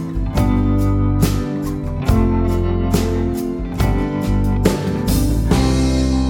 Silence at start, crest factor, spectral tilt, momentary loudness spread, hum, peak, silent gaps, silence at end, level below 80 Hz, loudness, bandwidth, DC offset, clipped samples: 0 s; 16 dB; -7 dB/octave; 5 LU; none; 0 dBFS; none; 0 s; -22 dBFS; -18 LUFS; 18 kHz; under 0.1%; under 0.1%